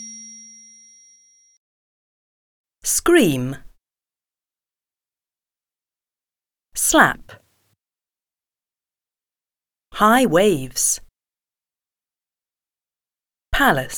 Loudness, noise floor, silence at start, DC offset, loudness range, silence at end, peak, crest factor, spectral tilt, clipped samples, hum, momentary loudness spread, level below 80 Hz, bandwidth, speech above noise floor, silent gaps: -17 LUFS; under -90 dBFS; 0 s; under 0.1%; 5 LU; 0 s; 0 dBFS; 24 dB; -3 dB/octave; under 0.1%; none; 22 LU; -46 dBFS; over 20 kHz; over 73 dB; 1.57-2.64 s